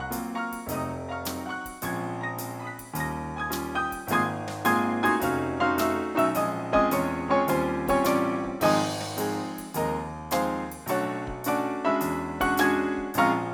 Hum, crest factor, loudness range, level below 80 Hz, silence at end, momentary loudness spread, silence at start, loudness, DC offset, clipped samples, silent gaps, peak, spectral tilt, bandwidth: none; 20 dB; 7 LU; -50 dBFS; 0 s; 9 LU; 0 s; -27 LUFS; under 0.1%; under 0.1%; none; -8 dBFS; -5 dB/octave; 19 kHz